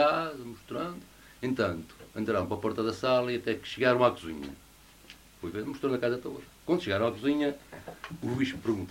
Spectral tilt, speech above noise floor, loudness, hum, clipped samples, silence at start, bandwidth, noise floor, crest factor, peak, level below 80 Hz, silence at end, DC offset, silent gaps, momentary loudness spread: -6 dB/octave; 23 dB; -31 LUFS; none; under 0.1%; 0 s; 16 kHz; -54 dBFS; 22 dB; -8 dBFS; -60 dBFS; 0 s; under 0.1%; none; 17 LU